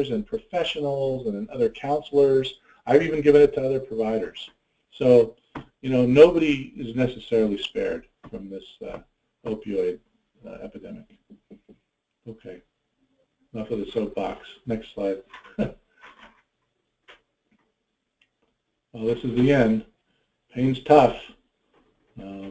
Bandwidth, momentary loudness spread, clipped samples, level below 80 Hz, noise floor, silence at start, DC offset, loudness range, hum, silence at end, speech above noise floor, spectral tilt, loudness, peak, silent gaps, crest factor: 8 kHz; 24 LU; under 0.1%; -52 dBFS; -78 dBFS; 0 s; under 0.1%; 16 LU; none; 0 s; 55 dB; -7.5 dB/octave; -22 LUFS; -2 dBFS; none; 22 dB